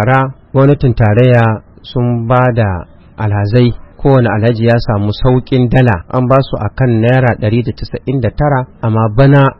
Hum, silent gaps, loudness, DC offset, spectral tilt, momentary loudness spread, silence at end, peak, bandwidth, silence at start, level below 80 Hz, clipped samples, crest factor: none; none; -12 LUFS; under 0.1%; -10 dB/octave; 8 LU; 0.05 s; 0 dBFS; 5.8 kHz; 0 s; -28 dBFS; 0.3%; 10 dB